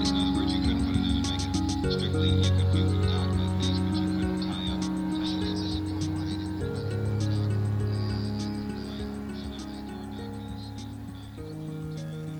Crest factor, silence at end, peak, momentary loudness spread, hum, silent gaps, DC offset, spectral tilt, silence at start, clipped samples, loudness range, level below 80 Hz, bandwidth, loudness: 16 dB; 0 s; -12 dBFS; 13 LU; none; none; under 0.1%; -6.5 dB/octave; 0 s; under 0.1%; 10 LU; -40 dBFS; 10 kHz; -29 LUFS